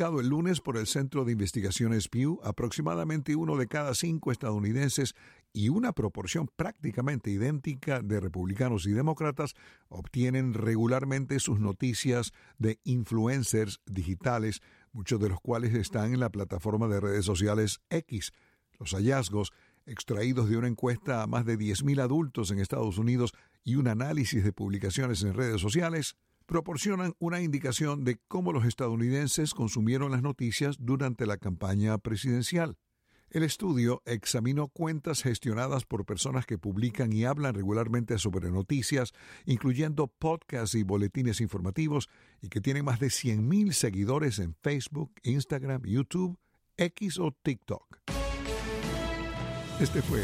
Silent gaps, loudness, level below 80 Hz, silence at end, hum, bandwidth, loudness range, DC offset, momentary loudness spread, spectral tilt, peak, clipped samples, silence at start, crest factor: none; -31 LUFS; -50 dBFS; 0 s; none; 16 kHz; 2 LU; under 0.1%; 6 LU; -5.5 dB/octave; -12 dBFS; under 0.1%; 0 s; 18 dB